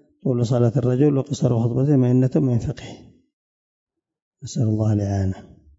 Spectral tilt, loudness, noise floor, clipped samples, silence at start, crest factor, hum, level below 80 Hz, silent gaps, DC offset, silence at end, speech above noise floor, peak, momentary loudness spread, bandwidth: -8.5 dB/octave; -20 LUFS; under -90 dBFS; under 0.1%; 0.25 s; 16 dB; none; -50 dBFS; 3.33-3.87 s, 4.22-4.31 s; under 0.1%; 0.35 s; over 71 dB; -6 dBFS; 13 LU; 8 kHz